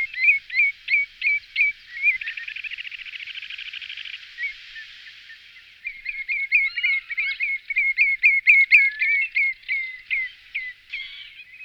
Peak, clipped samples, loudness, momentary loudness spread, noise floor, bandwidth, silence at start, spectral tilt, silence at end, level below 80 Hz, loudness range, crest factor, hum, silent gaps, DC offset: -4 dBFS; under 0.1%; -20 LUFS; 20 LU; -48 dBFS; 8.2 kHz; 0 s; 2 dB/octave; 0 s; -62 dBFS; 15 LU; 20 dB; none; none; under 0.1%